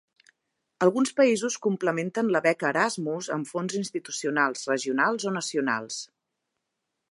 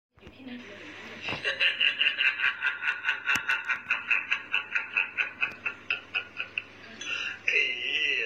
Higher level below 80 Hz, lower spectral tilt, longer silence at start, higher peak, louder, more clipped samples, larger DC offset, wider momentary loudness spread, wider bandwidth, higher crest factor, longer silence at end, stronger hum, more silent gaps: second, -80 dBFS vs -70 dBFS; first, -4 dB/octave vs -1 dB/octave; first, 0.8 s vs 0.2 s; about the same, -8 dBFS vs -10 dBFS; about the same, -26 LUFS vs -27 LUFS; neither; neither; second, 8 LU vs 18 LU; second, 11.5 kHz vs 15 kHz; about the same, 20 dB vs 20 dB; first, 1.05 s vs 0 s; neither; neither